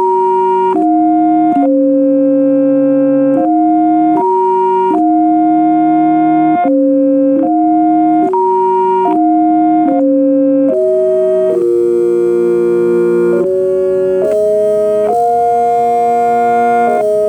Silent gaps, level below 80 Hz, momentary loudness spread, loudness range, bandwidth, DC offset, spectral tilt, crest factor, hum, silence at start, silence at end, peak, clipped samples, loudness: none; -54 dBFS; 2 LU; 1 LU; 9.4 kHz; under 0.1%; -8 dB/octave; 8 dB; none; 0 s; 0 s; -2 dBFS; under 0.1%; -11 LUFS